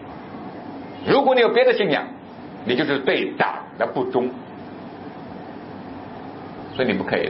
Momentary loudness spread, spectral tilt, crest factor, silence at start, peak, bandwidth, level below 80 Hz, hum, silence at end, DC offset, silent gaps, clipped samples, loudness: 20 LU; -10 dB/octave; 20 dB; 0 s; -4 dBFS; 5.8 kHz; -60 dBFS; none; 0 s; under 0.1%; none; under 0.1%; -21 LUFS